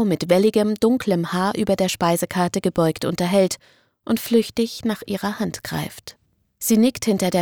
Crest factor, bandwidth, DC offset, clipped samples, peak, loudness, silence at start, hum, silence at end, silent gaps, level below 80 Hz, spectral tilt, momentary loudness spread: 16 dB; over 20 kHz; under 0.1%; under 0.1%; -4 dBFS; -21 LUFS; 0 s; none; 0 s; none; -54 dBFS; -5 dB/octave; 10 LU